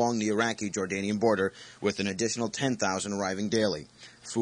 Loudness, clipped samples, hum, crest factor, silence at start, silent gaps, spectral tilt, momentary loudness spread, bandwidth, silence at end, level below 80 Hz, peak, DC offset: -29 LUFS; under 0.1%; none; 18 dB; 0 s; none; -4 dB/octave; 6 LU; 10.5 kHz; 0 s; -68 dBFS; -12 dBFS; under 0.1%